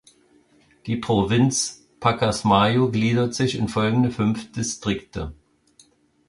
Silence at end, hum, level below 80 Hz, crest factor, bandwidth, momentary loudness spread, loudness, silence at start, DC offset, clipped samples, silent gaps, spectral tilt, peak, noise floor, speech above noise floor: 0.95 s; none; -46 dBFS; 18 dB; 11.5 kHz; 11 LU; -22 LUFS; 0.85 s; under 0.1%; under 0.1%; none; -5 dB/octave; -4 dBFS; -58 dBFS; 37 dB